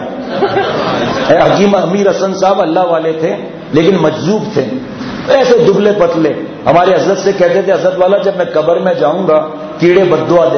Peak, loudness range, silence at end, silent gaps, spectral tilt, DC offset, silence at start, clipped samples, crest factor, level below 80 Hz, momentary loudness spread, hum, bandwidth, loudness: 0 dBFS; 2 LU; 0 s; none; -6 dB/octave; under 0.1%; 0 s; 0.2%; 10 dB; -46 dBFS; 8 LU; none; 6.6 kHz; -11 LUFS